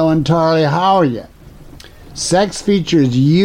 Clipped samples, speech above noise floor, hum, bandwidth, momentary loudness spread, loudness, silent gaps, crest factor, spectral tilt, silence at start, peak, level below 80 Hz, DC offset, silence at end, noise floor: under 0.1%; 24 dB; none; 12.5 kHz; 8 LU; -14 LUFS; none; 12 dB; -6 dB/octave; 0 s; -2 dBFS; -40 dBFS; under 0.1%; 0 s; -37 dBFS